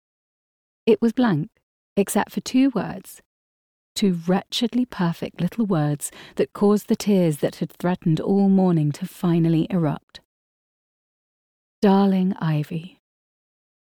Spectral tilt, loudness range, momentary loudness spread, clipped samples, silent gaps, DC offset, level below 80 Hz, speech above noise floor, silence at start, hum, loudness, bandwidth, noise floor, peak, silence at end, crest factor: -6.5 dB/octave; 4 LU; 10 LU; under 0.1%; 1.63-1.96 s, 3.25-3.95 s, 10.03-10.08 s, 10.25-11.82 s; under 0.1%; -60 dBFS; over 69 dB; 0.85 s; none; -22 LUFS; 19.5 kHz; under -90 dBFS; -6 dBFS; 1.1 s; 16 dB